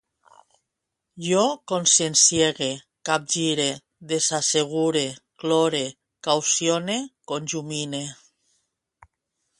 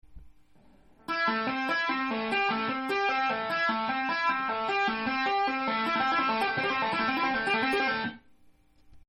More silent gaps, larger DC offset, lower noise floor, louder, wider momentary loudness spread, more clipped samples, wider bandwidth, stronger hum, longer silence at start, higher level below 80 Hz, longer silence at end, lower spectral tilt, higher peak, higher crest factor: neither; neither; first, -82 dBFS vs -59 dBFS; first, -22 LUFS vs -28 LUFS; first, 15 LU vs 3 LU; neither; second, 11.5 kHz vs 13.5 kHz; neither; first, 1.15 s vs 0.05 s; about the same, -66 dBFS vs -62 dBFS; first, 1.45 s vs 0.1 s; second, -2.5 dB/octave vs -4.5 dB/octave; first, -4 dBFS vs -16 dBFS; first, 22 dB vs 14 dB